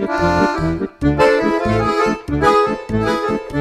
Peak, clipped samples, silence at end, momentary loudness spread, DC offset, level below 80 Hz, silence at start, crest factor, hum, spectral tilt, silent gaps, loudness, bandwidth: -2 dBFS; under 0.1%; 0 s; 6 LU; under 0.1%; -32 dBFS; 0 s; 14 dB; none; -6.5 dB/octave; none; -16 LUFS; 13.5 kHz